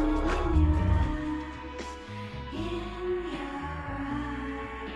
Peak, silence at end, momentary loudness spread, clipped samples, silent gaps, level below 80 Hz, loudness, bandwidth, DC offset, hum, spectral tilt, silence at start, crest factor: -14 dBFS; 0 s; 13 LU; under 0.1%; none; -34 dBFS; -32 LUFS; 9.2 kHz; under 0.1%; none; -7.5 dB/octave; 0 s; 16 dB